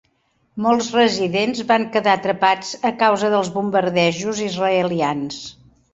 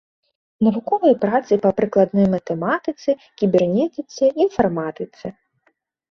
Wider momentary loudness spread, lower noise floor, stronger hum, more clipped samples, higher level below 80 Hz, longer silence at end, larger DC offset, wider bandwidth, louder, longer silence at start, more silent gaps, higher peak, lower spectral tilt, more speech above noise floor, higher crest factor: second, 6 LU vs 10 LU; about the same, -64 dBFS vs -66 dBFS; neither; neither; about the same, -60 dBFS vs -56 dBFS; second, 0.4 s vs 0.8 s; neither; first, 8 kHz vs 6.6 kHz; about the same, -19 LUFS vs -19 LUFS; about the same, 0.55 s vs 0.6 s; neither; about the same, -2 dBFS vs -2 dBFS; second, -4.5 dB/octave vs -7.5 dB/octave; about the same, 46 dB vs 47 dB; about the same, 18 dB vs 16 dB